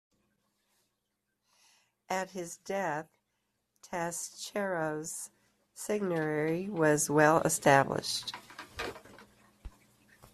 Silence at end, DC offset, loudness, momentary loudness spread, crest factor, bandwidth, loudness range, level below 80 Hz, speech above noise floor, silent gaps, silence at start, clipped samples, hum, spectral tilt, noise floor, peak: 0.65 s; under 0.1%; -31 LUFS; 17 LU; 24 dB; 14.5 kHz; 12 LU; -64 dBFS; 52 dB; none; 2.1 s; under 0.1%; none; -4 dB/octave; -83 dBFS; -8 dBFS